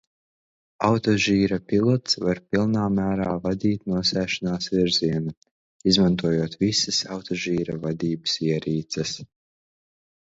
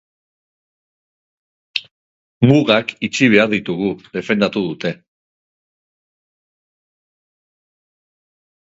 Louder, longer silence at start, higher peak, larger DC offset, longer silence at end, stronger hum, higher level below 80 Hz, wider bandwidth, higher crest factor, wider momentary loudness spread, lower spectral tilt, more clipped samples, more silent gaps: second, -23 LUFS vs -17 LUFS; second, 0.8 s vs 1.75 s; second, -4 dBFS vs 0 dBFS; neither; second, 1.05 s vs 3.7 s; neither; first, -50 dBFS vs -56 dBFS; about the same, 7.8 kHz vs 7.8 kHz; about the same, 20 dB vs 20 dB; second, 8 LU vs 13 LU; about the same, -5 dB/octave vs -6 dB/octave; neither; second, 5.37-5.42 s, 5.51-5.80 s vs 1.91-2.41 s